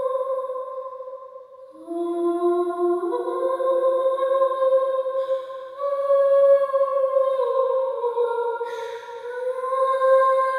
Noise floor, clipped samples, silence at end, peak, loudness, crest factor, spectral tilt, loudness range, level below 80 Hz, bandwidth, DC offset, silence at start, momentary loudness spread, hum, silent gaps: -43 dBFS; under 0.1%; 0 s; -8 dBFS; -22 LUFS; 14 dB; -4.5 dB/octave; 5 LU; -78 dBFS; 11 kHz; under 0.1%; 0 s; 16 LU; none; none